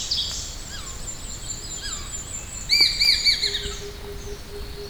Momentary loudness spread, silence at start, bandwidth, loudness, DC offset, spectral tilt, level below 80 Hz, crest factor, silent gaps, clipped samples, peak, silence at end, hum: 20 LU; 0 s; over 20 kHz; -22 LUFS; under 0.1%; -0.5 dB/octave; -38 dBFS; 20 dB; none; under 0.1%; -4 dBFS; 0 s; none